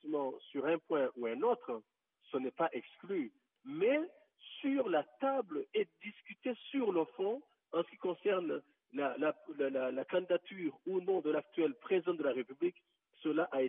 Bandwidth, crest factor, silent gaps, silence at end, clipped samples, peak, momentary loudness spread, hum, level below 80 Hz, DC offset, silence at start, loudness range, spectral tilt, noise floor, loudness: 3.8 kHz; 16 dB; none; 0 s; under 0.1%; -20 dBFS; 9 LU; none; under -90 dBFS; under 0.1%; 0.05 s; 2 LU; -1.5 dB/octave; -70 dBFS; -37 LUFS